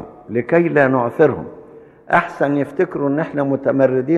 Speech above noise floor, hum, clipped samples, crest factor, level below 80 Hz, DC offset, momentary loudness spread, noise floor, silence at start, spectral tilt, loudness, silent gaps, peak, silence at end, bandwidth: 25 dB; none; under 0.1%; 16 dB; -58 dBFS; under 0.1%; 8 LU; -41 dBFS; 0 s; -9 dB/octave; -17 LUFS; none; -2 dBFS; 0 s; 7.6 kHz